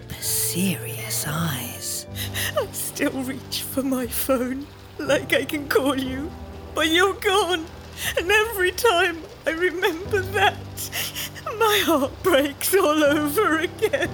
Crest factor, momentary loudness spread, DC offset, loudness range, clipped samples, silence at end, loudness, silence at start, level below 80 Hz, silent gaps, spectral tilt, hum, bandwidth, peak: 18 dB; 10 LU; under 0.1%; 5 LU; under 0.1%; 0 s; -22 LUFS; 0 s; -48 dBFS; none; -3.5 dB/octave; none; over 20 kHz; -6 dBFS